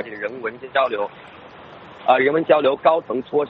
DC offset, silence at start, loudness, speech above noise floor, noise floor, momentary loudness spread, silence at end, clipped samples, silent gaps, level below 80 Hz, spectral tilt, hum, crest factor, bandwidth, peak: under 0.1%; 0 s; -20 LUFS; 22 dB; -41 dBFS; 13 LU; 0 s; under 0.1%; none; -64 dBFS; -2.5 dB/octave; none; 20 dB; 5.2 kHz; 0 dBFS